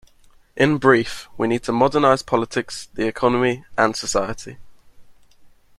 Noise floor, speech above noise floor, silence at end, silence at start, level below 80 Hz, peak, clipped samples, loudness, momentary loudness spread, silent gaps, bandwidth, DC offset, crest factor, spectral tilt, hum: -52 dBFS; 32 dB; 0.3 s; 0.55 s; -48 dBFS; -2 dBFS; under 0.1%; -20 LUFS; 13 LU; none; 13.5 kHz; under 0.1%; 20 dB; -5 dB/octave; none